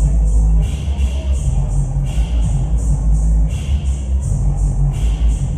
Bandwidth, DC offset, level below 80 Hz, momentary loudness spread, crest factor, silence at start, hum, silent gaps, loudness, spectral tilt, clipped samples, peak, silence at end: 9.6 kHz; under 0.1%; -16 dBFS; 4 LU; 10 dB; 0 s; none; none; -18 LUFS; -7 dB/octave; under 0.1%; -4 dBFS; 0 s